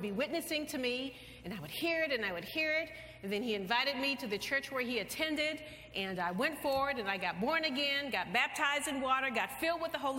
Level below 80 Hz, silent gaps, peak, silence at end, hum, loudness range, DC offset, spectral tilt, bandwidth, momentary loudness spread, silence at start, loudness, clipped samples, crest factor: -64 dBFS; none; -16 dBFS; 0 s; none; 3 LU; under 0.1%; -3 dB/octave; 16.5 kHz; 8 LU; 0 s; -34 LUFS; under 0.1%; 18 dB